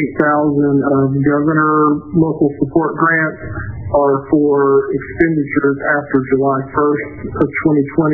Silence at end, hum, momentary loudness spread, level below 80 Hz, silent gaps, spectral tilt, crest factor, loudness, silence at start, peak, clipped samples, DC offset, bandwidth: 0 s; none; 6 LU; -40 dBFS; none; -13 dB/octave; 14 dB; -14 LUFS; 0 s; 0 dBFS; under 0.1%; under 0.1%; 2.4 kHz